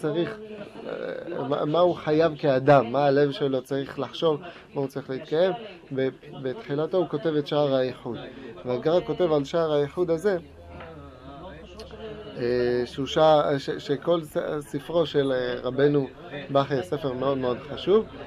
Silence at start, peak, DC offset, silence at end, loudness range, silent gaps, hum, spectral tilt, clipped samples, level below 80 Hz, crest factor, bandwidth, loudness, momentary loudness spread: 0 s; -6 dBFS; under 0.1%; 0 s; 5 LU; none; none; -7 dB/octave; under 0.1%; -56 dBFS; 20 dB; 14.5 kHz; -25 LUFS; 17 LU